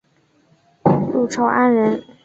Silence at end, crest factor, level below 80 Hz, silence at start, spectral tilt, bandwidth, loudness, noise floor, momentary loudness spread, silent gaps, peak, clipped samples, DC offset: 0.2 s; 16 dB; -54 dBFS; 0.85 s; -7 dB/octave; 8 kHz; -17 LUFS; -59 dBFS; 5 LU; none; -2 dBFS; under 0.1%; under 0.1%